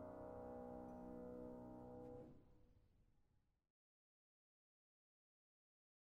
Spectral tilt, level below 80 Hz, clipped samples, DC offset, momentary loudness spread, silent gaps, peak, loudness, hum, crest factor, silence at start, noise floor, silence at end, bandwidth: -9 dB/octave; -74 dBFS; under 0.1%; under 0.1%; 4 LU; none; -44 dBFS; -57 LUFS; none; 14 dB; 0 s; -81 dBFS; 2.7 s; 6 kHz